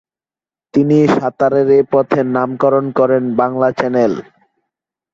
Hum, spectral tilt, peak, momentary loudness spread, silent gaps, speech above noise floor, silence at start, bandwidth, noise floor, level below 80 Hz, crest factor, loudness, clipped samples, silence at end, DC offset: none; -8 dB/octave; 0 dBFS; 5 LU; none; over 77 dB; 0.75 s; 7.6 kHz; under -90 dBFS; -56 dBFS; 14 dB; -14 LUFS; under 0.1%; 0.95 s; under 0.1%